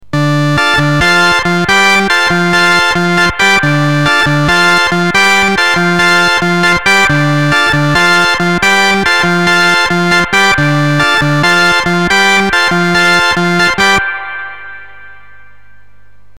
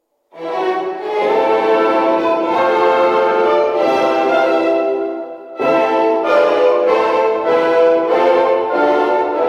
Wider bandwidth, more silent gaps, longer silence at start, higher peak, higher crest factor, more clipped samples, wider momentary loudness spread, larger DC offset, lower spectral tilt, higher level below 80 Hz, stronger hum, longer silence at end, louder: first, 18 kHz vs 9 kHz; neither; second, 0 s vs 0.35 s; about the same, 0 dBFS vs -2 dBFS; about the same, 8 dB vs 12 dB; neither; second, 3 LU vs 7 LU; first, 3% vs under 0.1%; about the same, -4 dB/octave vs -5 dB/octave; first, -36 dBFS vs -60 dBFS; first, 50 Hz at -40 dBFS vs none; first, 1.25 s vs 0 s; first, -8 LUFS vs -14 LUFS